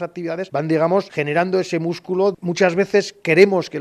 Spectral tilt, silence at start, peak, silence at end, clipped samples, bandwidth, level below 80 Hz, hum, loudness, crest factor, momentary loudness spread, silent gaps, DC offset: -6 dB/octave; 0 s; 0 dBFS; 0 s; under 0.1%; 11.5 kHz; -66 dBFS; none; -19 LUFS; 18 dB; 10 LU; none; under 0.1%